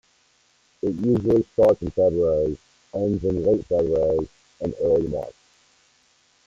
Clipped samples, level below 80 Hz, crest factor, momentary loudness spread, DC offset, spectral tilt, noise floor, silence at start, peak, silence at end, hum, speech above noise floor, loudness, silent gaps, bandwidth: under 0.1%; -46 dBFS; 16 dB; 13 LU; under 0.1%; -9.5 dB/octave; -62 dBFS; 0.85 s; -8 dBFS; 1.15 s; none; 41 dB; -22 LUFS; none; 7.6 kHz